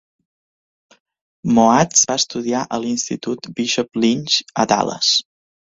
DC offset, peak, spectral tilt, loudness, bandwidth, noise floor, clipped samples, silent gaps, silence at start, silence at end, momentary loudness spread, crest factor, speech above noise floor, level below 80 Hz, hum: under 0.1%; 0 dBFS; -3 dB/octave; -17 LUFS; 7.8 kHz; under -90 dBFS; under 0.1%; none; 1.45 s; 0.6 s; 10 LU; 20 dB; over 72 dB; -56 dBFS; none